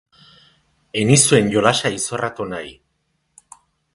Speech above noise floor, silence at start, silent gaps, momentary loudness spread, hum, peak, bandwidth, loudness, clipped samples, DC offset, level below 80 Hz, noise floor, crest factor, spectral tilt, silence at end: 52 dB; 0.95 s; none; 16 LU; none; 0 dBFS; 11.5 kHz; -17 LUFS; under 0.1%; under 0.1%; -54 dBFS; -69 dBFS; 20 dB; -4 dB/octave; 1.25 s